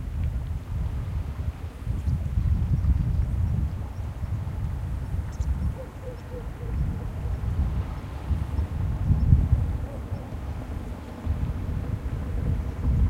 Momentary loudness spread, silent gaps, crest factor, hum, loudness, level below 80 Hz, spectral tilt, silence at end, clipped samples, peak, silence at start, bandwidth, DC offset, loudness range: 10 LU; none; 22 dB; none; -29 LUFS; -30 dBFS; -8.5 dB/octave; 0 s; under 0.1%; -4 dBFS; 0 s; 10 kHz; under 0.1%; 5 LU